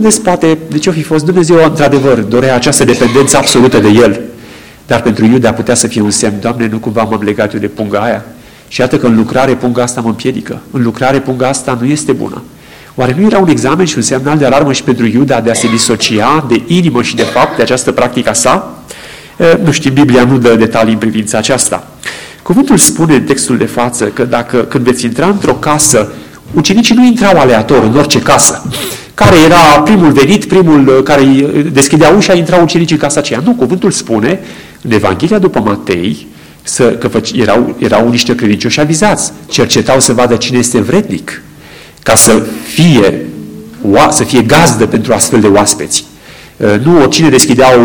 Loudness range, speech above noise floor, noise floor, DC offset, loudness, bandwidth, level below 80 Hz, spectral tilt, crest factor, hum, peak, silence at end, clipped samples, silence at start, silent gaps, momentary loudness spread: 6 LU; 25 dB; -33 dBFS; 0.9%; -8 LUFS; over 20 kHz; -36 dBFS; -4.5 dB/octave; 8 dB; none; 0 dBFS; 0 s; 0.2%; 0 s; none; 10 LU